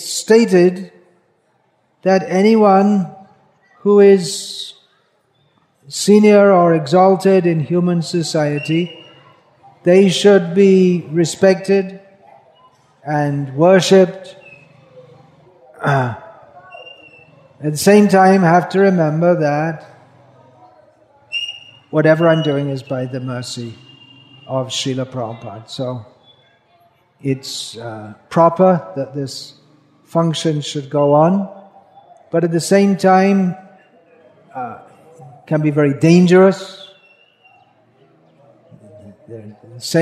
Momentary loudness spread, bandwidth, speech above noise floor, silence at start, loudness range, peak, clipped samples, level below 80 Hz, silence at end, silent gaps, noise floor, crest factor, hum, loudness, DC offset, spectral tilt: 19 LU; 14 kHz; 47 dB; 0 s; 11 LU; 0 dBFS; under 0.1%; -66 dBFS; 0 s; none; -61 dBFS; 16 dB; none; -14 LUFS; under 0.1%; -6 dB/octave